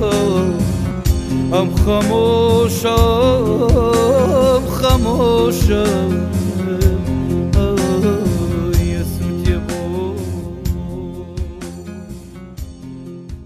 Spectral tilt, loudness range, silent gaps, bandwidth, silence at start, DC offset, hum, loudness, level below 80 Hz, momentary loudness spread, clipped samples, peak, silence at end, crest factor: -6.5 dB/octave; 10 LU; none; 15.5 kHz; 0 s; under 0.1%; none; -16 LUFS; -24 dBFS; 18 LU; under 0.1%; 0 dBFS; 0 s; 14 dB